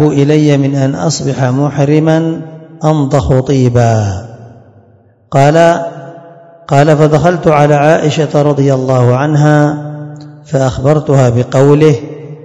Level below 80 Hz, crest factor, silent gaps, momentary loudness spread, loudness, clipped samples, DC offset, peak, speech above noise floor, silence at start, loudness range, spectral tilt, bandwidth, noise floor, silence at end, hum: -38 dBFS; 10 dB; none; 10 LU; -10 LUFS; 2%; under 0.1%; 0 dBFS; 37 dB; 0 s; 3 LU; -7 dB/octave; 8.4 kHz; -45 dBFS; 0.05 s; none